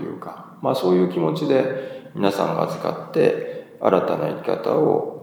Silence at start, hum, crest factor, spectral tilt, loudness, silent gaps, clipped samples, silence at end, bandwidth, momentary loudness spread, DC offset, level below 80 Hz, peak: 0 s; none; 20 dB; -7 dB/octave; -21 LUFS; none; under 0.1%; 0 s; 19.5 kHz; 12 LU; under 0.1%; -68 dBFS; -2 dBFS